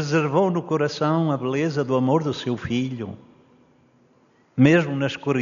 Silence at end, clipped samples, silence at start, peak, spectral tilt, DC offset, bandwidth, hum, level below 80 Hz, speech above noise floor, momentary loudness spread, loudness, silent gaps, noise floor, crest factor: 0 s; under 0.1%; 0 s; -2 dBFS; -6 dB/octave; under 0.1%; 7.2 kHz; none; -60 dBFS; 38 dB; 10 LU; -22 LUFS; none; -59 dBFS; 20 dB